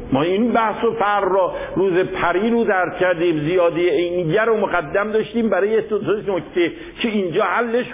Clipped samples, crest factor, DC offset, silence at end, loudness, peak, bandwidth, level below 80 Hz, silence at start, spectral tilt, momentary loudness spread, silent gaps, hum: under 0.1%; 14 dB; under 0.1%; 0 s; -19 LUFS; -4 dBFS; 3.8 kHz; -48 dBFS; 0 s; -10 dB/octave; 4 LU; none; none